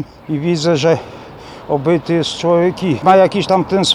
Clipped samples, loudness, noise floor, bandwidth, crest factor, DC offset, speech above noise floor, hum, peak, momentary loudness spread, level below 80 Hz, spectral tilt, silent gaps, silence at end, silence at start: under 0.1%; -14 LUFS; -34 dBFS; 11.5 kHz; 14 dB; under 0.1%; 20 dB; none; -2 dBFS; 17 LU; -48 dBFS; -5.5 dB/octave; none; 0 s; 0 s